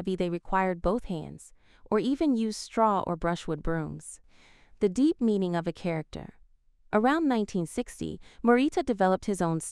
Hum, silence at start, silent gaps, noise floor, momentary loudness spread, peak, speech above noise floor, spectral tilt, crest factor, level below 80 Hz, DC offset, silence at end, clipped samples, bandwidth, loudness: none; 0 s; none; -59 dBFS; 13 LU; -8 dBFS; 32 dB; -6 dB/octave; 20 dB; -48 dBFS; under 0.1%; 0 s; under 0.1%; 13.5 kHz; -28 LUFS